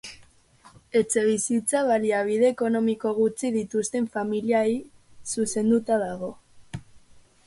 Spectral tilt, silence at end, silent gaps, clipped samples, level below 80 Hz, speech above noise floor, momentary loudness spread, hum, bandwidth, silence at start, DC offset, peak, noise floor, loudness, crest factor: -4.5 dB/octave; 0.5 s; none; under 0.1%; -60 dBFS; 31 dB; 15 LU; none; 11.5 kHz; 0.05 s; under 0.1%; -10 dBFS; -55 dBFS; -24 LUFS; 16 dB